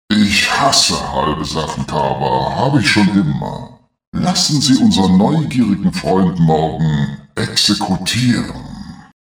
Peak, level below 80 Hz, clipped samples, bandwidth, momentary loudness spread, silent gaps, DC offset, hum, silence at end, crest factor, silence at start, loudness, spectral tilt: 0 dBFS; -38 dBFS; under 0.1%; over 20 kHz; 11 LU; 4.07-4.12 s; under 0.1%; none; 0.25 s; 14 dB; 0.1 s; -14 LUFS; -4.5 dB/octave